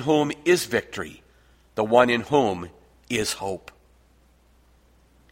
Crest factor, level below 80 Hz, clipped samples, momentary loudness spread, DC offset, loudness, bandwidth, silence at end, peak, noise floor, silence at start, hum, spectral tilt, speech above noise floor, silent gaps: 22 dB; -56 dBFS; under 0.1%; 17 LU; under 0.1%; -23 LUFS; 16 kHz; 1.75 s; -2 dBFS; -58 dBFS; 0 s; none; -4.5 dB/octave; 36 dB; none